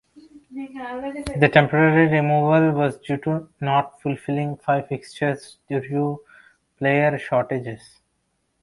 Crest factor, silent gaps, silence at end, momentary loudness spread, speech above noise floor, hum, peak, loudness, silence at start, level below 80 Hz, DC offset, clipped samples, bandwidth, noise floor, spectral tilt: 22 dB; none; 0.85 s; 17 LU; 50 dB; none; 0 dBFS; -21 LUFS; 0.15 s; -54 dBFS; under 0.1%; under 0.1%; 11.5 kHz; -71 dBFS; -7.5 dB/octave